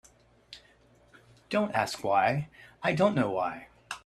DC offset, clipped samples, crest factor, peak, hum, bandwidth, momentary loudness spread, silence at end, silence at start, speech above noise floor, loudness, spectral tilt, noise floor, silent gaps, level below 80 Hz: under 0.1%; under 0.1%; 20 dB; -10 dBFS; none; 14.5 kHz; 24 LU; 0.05 s; 0.5 s; 33 dB; -29 LUFS; -5.5 dB/octave; -61 dBFS; none; -66 dBFS